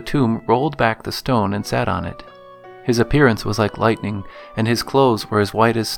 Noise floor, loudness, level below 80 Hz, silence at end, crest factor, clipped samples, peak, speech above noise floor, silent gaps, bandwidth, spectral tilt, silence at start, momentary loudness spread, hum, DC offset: -41 dBFS; -19 LUFS; -40 dBFS; 0 s; 18 dB; under 0.1%; 0 dBFS; 22 dB; none; 18.5 kHz; -6 dB/octave; 0 s; 11 LU; none; under 0.1%